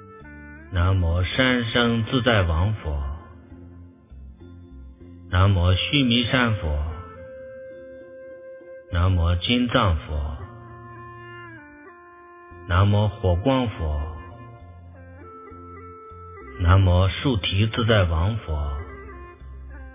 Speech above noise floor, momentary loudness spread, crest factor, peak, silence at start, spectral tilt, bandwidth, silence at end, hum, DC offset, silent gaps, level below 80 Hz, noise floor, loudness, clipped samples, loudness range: 26 dB; 23 LU; 22 dB; -2 dBFS; 0 s; -10.5 dB/octave; 3.8 kHz; 0 s; none; under 0.1%; none; -32 dBFS; -46 dBFS; -22 LUFS; under 0.1%; 5 LU